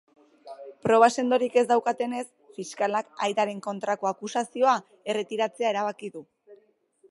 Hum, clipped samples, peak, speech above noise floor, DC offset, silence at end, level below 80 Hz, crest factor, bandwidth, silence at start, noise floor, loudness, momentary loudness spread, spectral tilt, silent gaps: none; under 0.1%; -6 dBFS; 37 dB; under 0.1%; 0.55 s; -76 dBFS; 22 dB; 11.5 kHz; 0.45 s; -62 dBFS; -26 LUFS; 19 LU; -4 dB/octave; none